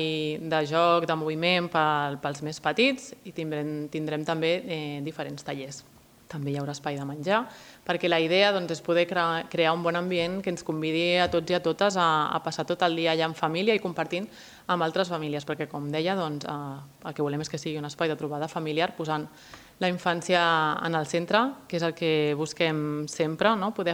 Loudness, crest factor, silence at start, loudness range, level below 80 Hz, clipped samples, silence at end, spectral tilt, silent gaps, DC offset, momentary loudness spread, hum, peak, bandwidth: -27 LUFS; 20 dB; 0 s; 6 LU; -66 dBFS; under 0.1%; 0 s; -5 dB/octave; none; under 0.1%; 11 LU; none; -6 dBFS; 17 kHz